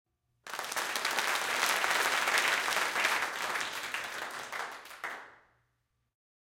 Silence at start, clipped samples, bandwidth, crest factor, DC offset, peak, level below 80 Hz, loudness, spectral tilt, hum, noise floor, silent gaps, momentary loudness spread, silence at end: 0.45 s; under 0.1%; 17 kHz; 24 dB; under 0.1%; -10 dBFS; -76 dBFS; -31 LUFS; 0.5 dB/octave; none; -79 dBFS; none; 14 LU; 1.15 s